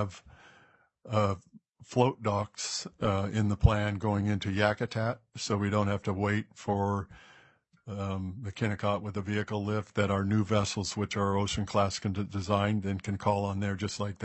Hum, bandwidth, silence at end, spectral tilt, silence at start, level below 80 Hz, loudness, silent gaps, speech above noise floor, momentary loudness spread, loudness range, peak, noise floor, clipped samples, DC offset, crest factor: none; 8.4 kHz; 0 s; -6 dB/octave; 0 s; -48 dBFS; -31 LUFS; none; 33 dB; 7 LU; 4 LU; -6 dBFS; -63 dBFS; under 0.1%; under 0.1%; 24 dB